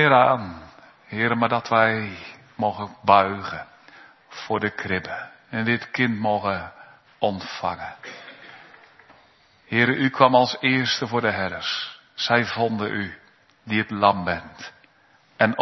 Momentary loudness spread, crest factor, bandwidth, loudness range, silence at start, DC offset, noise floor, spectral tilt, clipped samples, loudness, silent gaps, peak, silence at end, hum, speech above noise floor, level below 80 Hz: 21 LU; 24 dB; 6.2 kHz; 6 LU; 0 s; under 0.1%; -58 dBFS; -5.5 dB/octave; under 0.1%; -22 LUFS; none; 0 dBFS; 0 s; none; 36 dB; -62 dBFS